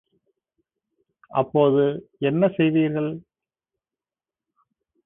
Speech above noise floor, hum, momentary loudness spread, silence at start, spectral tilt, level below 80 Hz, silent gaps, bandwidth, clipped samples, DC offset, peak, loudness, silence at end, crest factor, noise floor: over 69 dB; none; 9 LU; 1.3 s; -12 dB/octave; -66 dBFS; none; 3.8 kHz; under 0.1%; under 0.1%; -6 dBFS; -22 LUFS; 1.85 s; 18 dB; under -90 dBFS